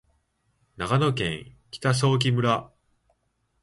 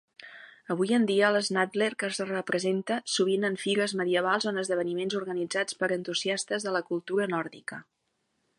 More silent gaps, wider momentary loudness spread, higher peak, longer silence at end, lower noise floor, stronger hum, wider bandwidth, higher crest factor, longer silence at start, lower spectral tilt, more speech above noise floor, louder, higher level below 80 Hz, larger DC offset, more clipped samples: neither; about the same, 13 LU vs 11 LU; about the same, -8 dBFS vs -10 dBFS; first, 0.95 s vs 0.75 s; second, -72 dBFS vs -77 dBFS; neither; about the same, 11.5 kHz vs 11.5 kHz; about the same, 18 dB vs 18 dB; first, 0.8 s vs 0.2 s; first, -5.5 dB/octave vs -4 dB/octave; about the same, 49 dB vs 48 dB; first, -24 LUFS vs -28 LUFS; first, -54 dBFS vs -80 dBFS; neither; neither